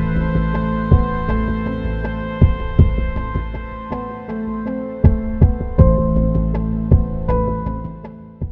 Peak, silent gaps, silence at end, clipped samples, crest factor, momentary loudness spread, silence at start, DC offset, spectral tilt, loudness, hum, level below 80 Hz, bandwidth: 0 dBFS; none; 0 s; under 0.1%; 18 dB; 11 LU; 0 s; under 0.1%; -11.5 dB/octave; -19 LUFS; none; -22 dBFS; 4.4 kHz